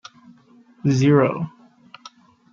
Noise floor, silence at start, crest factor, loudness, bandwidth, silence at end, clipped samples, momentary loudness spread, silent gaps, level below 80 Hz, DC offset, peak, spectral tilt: -52 dBFS; 0.85 s; 18 dB; -19 LUFS; 7.4 kHz; 1.05 s; under 0.1%; 14 LU; none; -64 dBFS; under 0.1%; -4 dBFS; -7.5 dB/octave